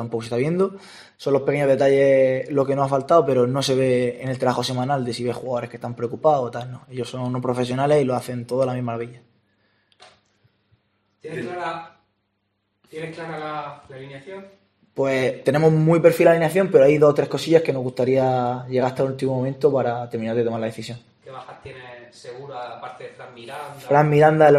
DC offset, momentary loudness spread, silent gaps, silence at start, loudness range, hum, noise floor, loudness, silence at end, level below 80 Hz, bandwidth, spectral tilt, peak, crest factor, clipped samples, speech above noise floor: under 0.1%; 22 LU; none; 0 s; 17 LU; none; -72 dBFS; -20 LUFS; 0 s; -62 dBFS; 14 kHz; -6.5 dB/octave; -2 dBFS; 20 dB; under 0.1%; 52 dB